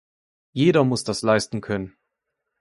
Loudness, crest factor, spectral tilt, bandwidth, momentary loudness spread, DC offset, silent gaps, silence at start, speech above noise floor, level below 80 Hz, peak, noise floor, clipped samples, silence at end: -22 LUFS; 20 dB; -5.5 dB/octave; 11.5 kHz; 13 LU; under 0.1%; none; 0.55 s; 59 dB; -56 dBFS; -4 dBFS; -80 dBFS; under 0.1%; 0.75 s